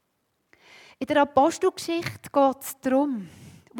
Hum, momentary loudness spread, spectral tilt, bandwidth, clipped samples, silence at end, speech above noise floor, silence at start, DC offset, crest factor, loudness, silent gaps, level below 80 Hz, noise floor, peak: none; 12 LU; -4.5 dB/octave; 18 kHz; under 0.1%; 0 s; 50 dB; 1 s; under 0.1%; 18 dB; -24 LUFS; none; -66 dBFS; -74 dBFS; -8 dBFS